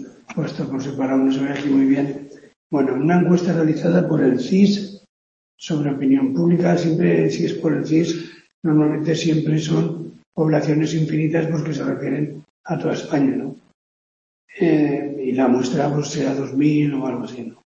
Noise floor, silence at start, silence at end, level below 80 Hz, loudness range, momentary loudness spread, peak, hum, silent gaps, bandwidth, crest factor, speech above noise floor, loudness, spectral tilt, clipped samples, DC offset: under -90 dBFS; 0 s; 0.15 s; -62 dBFS; 4 LU; 10 LU; -2 dBFS; none; 2.56-2.70 s, 5.09-5.58 s, 8.54-8.62 s, 10.26-10.32 s, 12.50-12.64 s, 13.74-14.48 s; 7.6 kHz; 16 dB; over 71 dB; -19 LUFS; -7 dB/octave; under 0.1%; under 0.1%